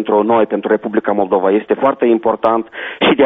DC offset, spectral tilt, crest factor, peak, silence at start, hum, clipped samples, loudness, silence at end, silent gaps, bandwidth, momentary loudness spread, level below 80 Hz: under 0.1%; -3.5 dB/octave; 14 dB; 0 dBFS; 0 s; none; under 0.1%; -15 LUFS; 0 s; none; 3.9 kHz; 3 LU; -54 dBFS